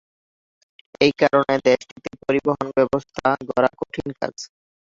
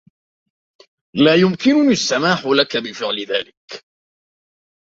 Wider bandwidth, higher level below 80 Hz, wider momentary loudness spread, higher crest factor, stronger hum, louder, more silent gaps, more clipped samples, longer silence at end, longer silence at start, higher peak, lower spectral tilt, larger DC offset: about the same, 7.8 kHz vs 7.8 kHz; about the same, -56 dBFS vs -60 dBFS; second, 12 LU vs 20 LU; about the same, 20 dB vs 18 dB; neither; second, -21 LUFS vs -16 LUFS; second, 1.92-1.96 s vs 3.57-3.68 s; neither; second, 0.5 s vs 1.05 s; second, 1 s vs 1.15 s; about the same, -2 dBFS vs 0 dBFS; about the same, -5.5 dB/octave vs -4.5 dB/octave; neither